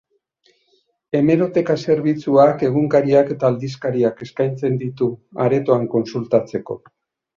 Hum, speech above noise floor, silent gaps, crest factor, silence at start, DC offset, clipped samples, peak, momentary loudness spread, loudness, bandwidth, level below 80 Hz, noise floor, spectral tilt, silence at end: none; 46 dB; none; 16 dB; 1.15 s; under 0.1%; under 0.1%; -2 dBFS; 9 LU; -18 LUFS; 7.2 kHz; -60 dBFS; -63 dBFS; -8.5 dB/octave; 0.6 s